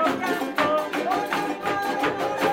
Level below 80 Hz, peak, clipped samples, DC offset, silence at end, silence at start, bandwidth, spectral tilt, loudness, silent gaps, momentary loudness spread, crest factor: -62 dBFS; -8 dBFS; under 0.1%; under 0.1%; 0 s; 0 s; 17 kHz; -4 dB/octave; -25 LUFS; none; 3 LU; 16 dB